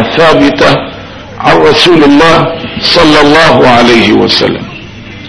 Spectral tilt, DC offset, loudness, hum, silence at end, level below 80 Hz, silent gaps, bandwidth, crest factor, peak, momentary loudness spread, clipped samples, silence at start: -5 dB/octave; under 0.1%; -5 LUFS; none; 0 s; -32 dBFS; none; 11 kHz; 6 dB; 0 dBFS; 18 LU; 7%; 0 s